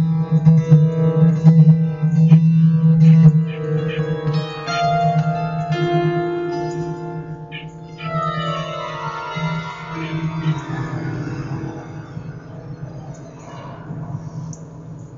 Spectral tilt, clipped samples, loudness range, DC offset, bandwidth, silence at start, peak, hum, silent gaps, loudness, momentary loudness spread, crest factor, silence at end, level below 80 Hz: -8.5 dB/octave; under 0.1%; 17 LU; under 0.1%; 7 kHz; 0 s; 0 dBFS; none; none; -17 LUFS; 21 LU; 16 dB; 0 s; -48 dBFS